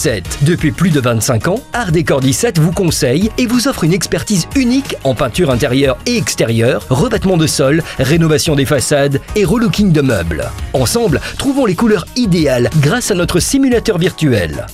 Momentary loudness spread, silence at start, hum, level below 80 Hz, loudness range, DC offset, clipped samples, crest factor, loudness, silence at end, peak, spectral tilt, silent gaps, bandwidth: 4 LU; 0 s; none; -30 dBFS; 1 LU; under 0.1%; under 0.1%; 10 dB; -13 LUFS; 0 s; -2 dBFS; -5 dB/octave; none; 16 kHz